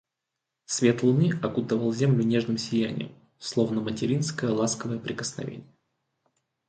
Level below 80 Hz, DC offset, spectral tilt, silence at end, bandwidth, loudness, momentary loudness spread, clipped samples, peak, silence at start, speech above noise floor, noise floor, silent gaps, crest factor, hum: -64 dBFS; under 0.1%; -5.5 dB/octave; 1.05 s; 9.2 kHz; -26 LUFS; 13 LU; under 0.1%; -8 dBFS; 0.7 s; 59 dB; -85 dBFS; none; 20 dB; none